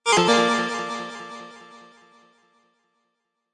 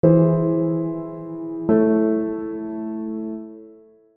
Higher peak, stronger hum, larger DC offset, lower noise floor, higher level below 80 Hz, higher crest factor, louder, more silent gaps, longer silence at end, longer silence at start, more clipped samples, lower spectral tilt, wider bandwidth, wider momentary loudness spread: second, -6 dBFS vs -2 dBFS; neither; neither; first, -76 dBFS vs -48 dBFS; second, -68 dBFS vs -58 dBFS; about the same, 18 dB vs 18 dB; about the same, -21 LUFS vs -22 LUFS; neither; first, 1.75 s vs 0.45 s; about the same, 0.05 s vs 0.05 s; neither; second, -3 dB/octave vs -14 dB/octave; first, 11.5 kHz vs 2.8 kHz; first, 24 LU vs 15 LU